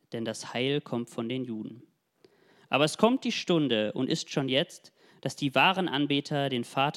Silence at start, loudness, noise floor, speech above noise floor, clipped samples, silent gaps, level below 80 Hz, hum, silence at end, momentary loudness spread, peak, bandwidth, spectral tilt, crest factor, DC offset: 0.1 s; -28 LUFS; -64 dBFS; 36 dB; under 0.1%; none; -76 dBFS; none; 0 s; 12 LU; -6 dBFS; 14.5 kHz; -5 dB/octave; 22 dB; under 0.1%